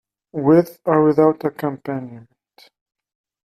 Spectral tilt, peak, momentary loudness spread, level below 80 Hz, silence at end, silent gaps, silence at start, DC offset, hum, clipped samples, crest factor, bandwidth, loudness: -9 dB/octave; -2 dBFS; 14 LU; -62 dBFS; 1.35 s; none; 0.35 s; under 0.1%; none; under 0.1%; 18 dB; 14 kHz; -18 LUFS